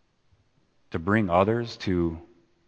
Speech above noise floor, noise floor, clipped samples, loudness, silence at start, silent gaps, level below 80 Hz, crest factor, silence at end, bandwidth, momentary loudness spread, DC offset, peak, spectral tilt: 41 dB; -65 dBFS; under 0.1%; -26 LUFS; 0.9 s; none; -52 dBFS; 22 dB; 0.45 s; 8.4 kHz; 13 LU; under 0.1%; -6 dBFS; -7.5 dB/octave